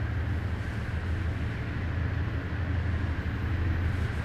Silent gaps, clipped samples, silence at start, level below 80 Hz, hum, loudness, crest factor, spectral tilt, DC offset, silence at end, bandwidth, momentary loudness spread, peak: none; under 0.1%; 0 s; -38 dBFS; none; -31 LUFS; 12 dB; -7.5 dB/octave; under 0.1%; 0 s; 7.4 kHz; 3 LU; -18 dBFS